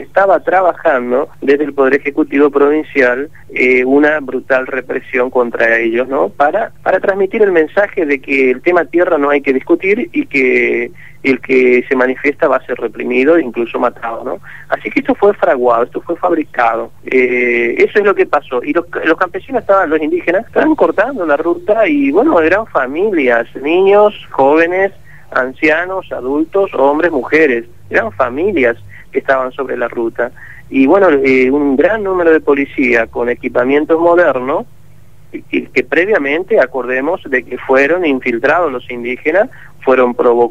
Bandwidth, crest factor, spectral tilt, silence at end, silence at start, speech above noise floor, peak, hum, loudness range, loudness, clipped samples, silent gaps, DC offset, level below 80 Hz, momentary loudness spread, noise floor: 7.8 kHz; 12 dB; -6.5 dB/octave; 0 s; 0 s; 31 dB; 0 dBFS; 50 Hz at -50 dBFS; 3 LU; -13 LUFS; under 0.1%; none; 2%; -48 dBFS; 8 LU; -43 dBFS